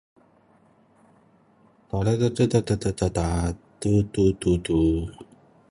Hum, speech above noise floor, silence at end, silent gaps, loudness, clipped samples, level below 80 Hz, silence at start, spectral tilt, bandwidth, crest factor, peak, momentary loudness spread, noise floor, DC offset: none; 36 dB; 0.45 s; none; -24 LUFS; under 0.1%; -38 dBFS; 1.95 s; -7 dB/octave; 11.5 kHz; 18 dB; -6 dBFS; 9 LU; -59 dBFS; under 0.1%